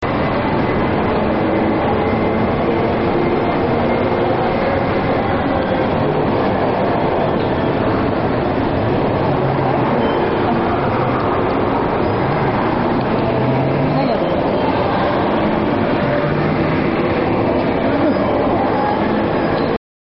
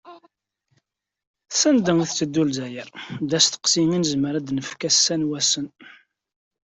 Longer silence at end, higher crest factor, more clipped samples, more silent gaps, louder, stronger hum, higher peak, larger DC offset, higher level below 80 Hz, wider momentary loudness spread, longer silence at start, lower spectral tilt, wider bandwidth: second, 0.25 s vs 0.75 s; second, 12 dB vs 20 dB; neither; second, none vs 1.27-1.34 s; first, -17 LUFS vs -20 LUFS; neither; about the same, -4 dBFS vs -4 dBFS; first, 0.4% vs under 0.1%; first, -34 dBFS vs -62 dBFS; second, 1 LU vs 13 LU; about the same, 0 s vs 0.05 s; first, -6 dB/octave vs -3 dB/octave; second, 5.8 kHz vs 8.4 kHz